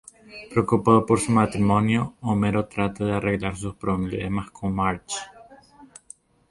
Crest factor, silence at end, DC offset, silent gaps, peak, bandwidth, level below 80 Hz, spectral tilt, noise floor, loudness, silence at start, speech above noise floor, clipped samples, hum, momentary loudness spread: 22 dB; 0.65 s; under 0.1%; none; -2 dBFS; 11.5 kHz; -46 dBFS; -6.5 dB/octave; -51 dBFS; -23 LUFS; 0.3 s; 28 dB; under 0.1%; none; 13 LU